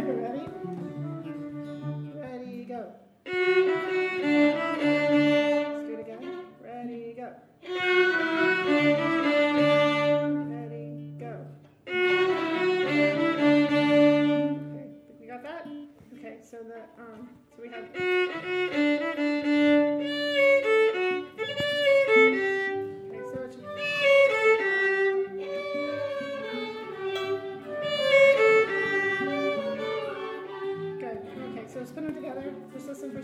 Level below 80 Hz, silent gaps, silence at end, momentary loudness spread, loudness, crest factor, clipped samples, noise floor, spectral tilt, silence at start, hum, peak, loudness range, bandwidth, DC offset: -74 dBFS; none; 0 s; 19 LU; -25 LUFS; 18 dB; under 0.1%; -47 dBFS; -5.5 dB/octave; 0 s; none; -8 dBFS; 10 LU; 12 kHz; under 0.1%